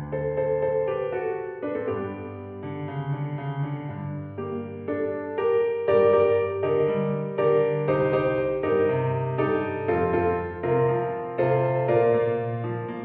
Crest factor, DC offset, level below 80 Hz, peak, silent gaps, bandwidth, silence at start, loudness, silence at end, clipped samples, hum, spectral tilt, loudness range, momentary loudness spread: 16 dB; under 0.1%; -56 dBFS; -8 dBFS; none; 4.4 kHz; 0 s; -25 LUFS; 0 s; under 0.1%; none; -7 dB/octave; 9 LU; 11 LU